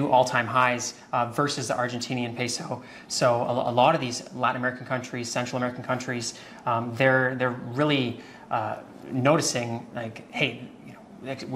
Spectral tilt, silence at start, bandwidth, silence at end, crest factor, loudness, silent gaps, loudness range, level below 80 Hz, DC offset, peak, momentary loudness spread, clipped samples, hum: -4.5 dB/octave; 0 s; 15.5 kHz; 0 s; 20 dB; -26 LUFS; none; 2 LU; -66 dBFS; under 0.1%; -6 dBFS; 14 LU; under 0.1%; none